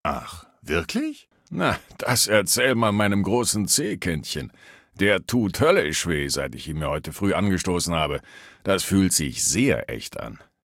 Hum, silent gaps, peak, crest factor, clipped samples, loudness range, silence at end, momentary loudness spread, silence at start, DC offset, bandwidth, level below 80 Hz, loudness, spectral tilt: none; none; -4 dBFS; 20 dB; under 0.1%; 2 LU; 0.25 s; 13 LU; 0.05 s; under 0.1%; 17 kHz; -46 dBFS; -23 LUFS; -3.5 dB/octave